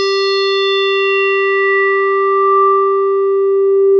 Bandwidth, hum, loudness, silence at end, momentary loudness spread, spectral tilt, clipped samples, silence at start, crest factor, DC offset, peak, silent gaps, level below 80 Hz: 6.2 kHz; none; -12 LUFS; 0 s; 3 LU; -1 dB/octave; under 0.1%; 0 s; 8 dB; under 0.1%; -4 dBFS; none; -84 dBFS